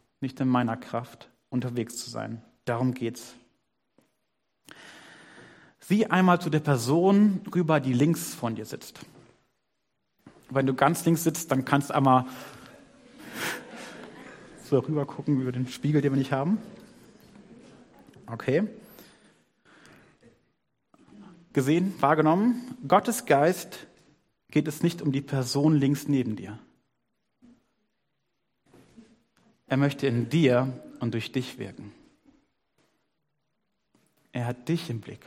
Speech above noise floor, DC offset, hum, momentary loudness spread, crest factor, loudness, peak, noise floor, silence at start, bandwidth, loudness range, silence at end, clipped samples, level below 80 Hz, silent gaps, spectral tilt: 54 dB; under 0.1%; none; 20 LU; 24 dB; -26 LUFS; -4 dBFS; -80 dBFS; 0.2 s; 16 kHz; 11 LU; 0.1 s; under 0.1%; -68 dBFS; none; -6 dB/octave